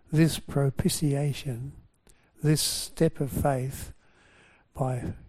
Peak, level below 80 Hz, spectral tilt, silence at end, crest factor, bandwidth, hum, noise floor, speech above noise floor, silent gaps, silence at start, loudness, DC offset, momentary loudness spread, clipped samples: -10 dBFS; -48 dBFS; -5.5 dB/octave; 0 s; 20 dB; 16 kHz; none; -60 dBFS; 34 dB; none; 0.1 s; -28 LUFS; under 0.1%; 14 LU; under 0.1%